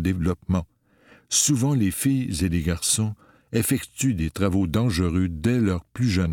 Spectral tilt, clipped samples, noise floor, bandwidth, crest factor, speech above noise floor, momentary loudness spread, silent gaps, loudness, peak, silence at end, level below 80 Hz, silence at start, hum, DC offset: -5 dB/octave; under 0.1%; -56 dBFS; 19 kHz; 16 dB; 33 dB; 6 LU; none; -23 LUFS; -6 dBFS; 0 s; -40 dBFS; 0 s; none; under 0.1%